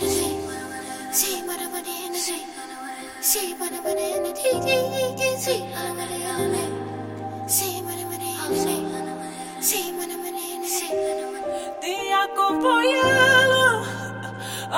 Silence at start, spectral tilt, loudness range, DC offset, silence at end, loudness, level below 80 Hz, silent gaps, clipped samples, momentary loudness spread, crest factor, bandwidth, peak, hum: 0 s; -2.5 dB/octave; 7 LU; under 0.1%; 0 s; -23 LUFS; -58 dBFS; none; under 0.1%; 14 LU; 20 dB; 16.5 kHz; -4 dBFS; none